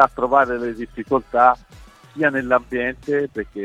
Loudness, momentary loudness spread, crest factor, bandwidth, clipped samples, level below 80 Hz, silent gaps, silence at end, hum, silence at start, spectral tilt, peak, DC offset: -20 LUFS; 11 LU; 20 dB; 11 kHz; under 0.1%; -48 dBFS; none; 0 s; none; 0 s; -7 dB/octave; 0 dBFS; under 0.1%